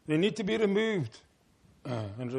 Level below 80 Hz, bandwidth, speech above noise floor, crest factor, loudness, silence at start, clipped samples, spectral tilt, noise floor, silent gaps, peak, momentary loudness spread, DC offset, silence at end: -68 dBFS; 10.5 kHz; 34 dB; 16 dB; -31 LUFS; 0.05 s; under 0.1%; -6.5 dB/octave; -64 dBFS; none; -14 dBFS; 12 LU; under 0.1%; 0 s